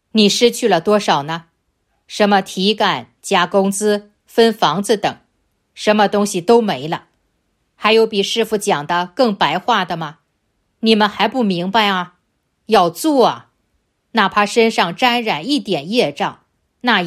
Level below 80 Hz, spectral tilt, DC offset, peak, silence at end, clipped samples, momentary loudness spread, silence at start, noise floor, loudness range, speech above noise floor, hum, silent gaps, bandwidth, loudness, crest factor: -60 dBFS; -4 dB/octave; under 0.1%; 0 dBFS; 0 s; under 0.1%; 9 LU; 0.15 s; -67 dBFS; 1 LU; 52 dB; none; none; 15.5 kHz; -16 LUFS; 16 dB